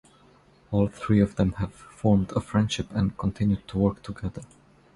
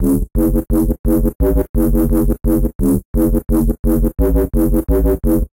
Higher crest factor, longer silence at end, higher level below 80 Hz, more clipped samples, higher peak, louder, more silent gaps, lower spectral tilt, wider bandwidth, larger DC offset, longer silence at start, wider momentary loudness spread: first, 18 dB vs 10 dB; first, 0.5 s vs 0.1 s; second, -44 dBFS vs -18 dBFS; neither; about the same, -8 dBFS vs -6 dBFS; second, -26 LUFS vs -16 LUFS; second, none vs 0.99-1.04 s, 1.35-1.39 s, 1.69-1.74 s, 2.75-2.79 s, 3.05-3.14 s, 3.79-3.83 s; second, -7.5 dB/octave vs -9 dB/octave; second, 11.5 kHz vs 17 kHz; second, under 0.1% vs 0.3%; first, 0.7 s vs 0 s; first, 12 LU vs 2 LU